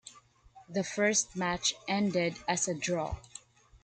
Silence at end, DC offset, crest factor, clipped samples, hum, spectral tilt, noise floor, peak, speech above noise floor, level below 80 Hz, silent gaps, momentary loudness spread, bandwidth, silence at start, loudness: 0.1 s; under 0.1%; 18 dB; under 0.1%; none; -3 dB/octave; -59 dBFS; -14 dBFS; 27 dB; -56 dBFS; none; 12 LU; 10 kHz; 0.05 s; -31 LUFS